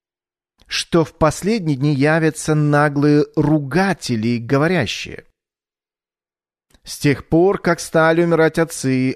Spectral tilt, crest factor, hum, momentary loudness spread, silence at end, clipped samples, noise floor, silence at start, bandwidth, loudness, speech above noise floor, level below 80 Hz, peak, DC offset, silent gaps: -6 dB/octave; 14 dB; none; 6 LU; 0 s; under 0.1%; under -90 dBFS; 0.7 s; 13.5 kHz; -17 LUFS; over 74 dB; -46 dBFS; -4 dBFS; under 0.1%; none